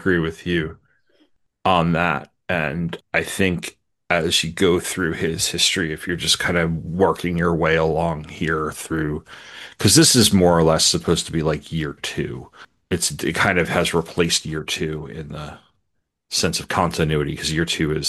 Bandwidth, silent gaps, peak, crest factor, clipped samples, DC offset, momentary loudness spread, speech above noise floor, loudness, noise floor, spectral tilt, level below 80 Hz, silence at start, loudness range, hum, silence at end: 13 kHz; none; 0 dBFS; 20 dB; under 0.1%; under 0.1%; 12 LU; 54 dB; -20 LUFS; -74 dBFS; -3.5 dB/octave; -46 dBFS; 0 s; 6 LU; none; 0 s